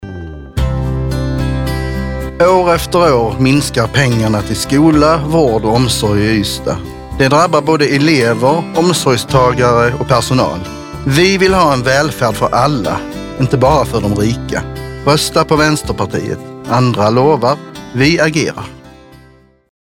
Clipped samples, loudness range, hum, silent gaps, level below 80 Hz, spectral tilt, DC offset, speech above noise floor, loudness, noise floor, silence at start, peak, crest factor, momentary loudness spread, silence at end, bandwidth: under 0.1%; 3 LU; none; none; -28 dBFS; -5.5 dB/octave; under 0.1%; 33 dB; -12 LUFS; -45 dBFS; 0 s; 0 dBFS; 12 dB; 10 LU; 0.75 s; 17 kHz